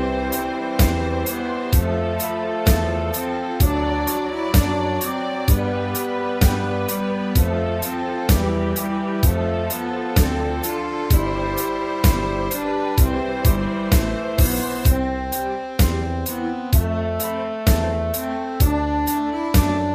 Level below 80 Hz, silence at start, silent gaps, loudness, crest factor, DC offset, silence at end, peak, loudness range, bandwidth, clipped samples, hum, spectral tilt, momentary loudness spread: -24 dBFS; 0 s; none; -21 LUFS; 18 dB; under 0.1%; 0 s; -2 dBFS; 1 LU; 15.5 kHz; under 0.1%; none; -6 dB/octave; 5 LU